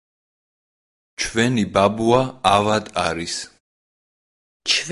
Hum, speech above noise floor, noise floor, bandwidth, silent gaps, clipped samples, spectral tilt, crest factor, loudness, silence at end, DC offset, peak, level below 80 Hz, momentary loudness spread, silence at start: none; over 71 dB; under -90 dBFS; 11.5 kHz; 3.60-4.60 s; under 0.1%; -4 dB/octave; 20 dB; -20 LUFS; 0 s; under 0.1%; -2 dBFS; -48 dBFS; 12 LU; 1.2 s